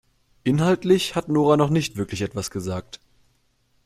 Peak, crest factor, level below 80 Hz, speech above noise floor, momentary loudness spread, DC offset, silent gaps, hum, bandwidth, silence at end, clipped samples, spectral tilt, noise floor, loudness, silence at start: -4 dBFS; 18 dB; -54 dBFS; 44 dB; 13 LU; under 0.1%; none; none; 15 kHz; 0.9 s; under 0.1%; -6 dB/octave; -65 dBFS; -22 LUFS; 0.45 s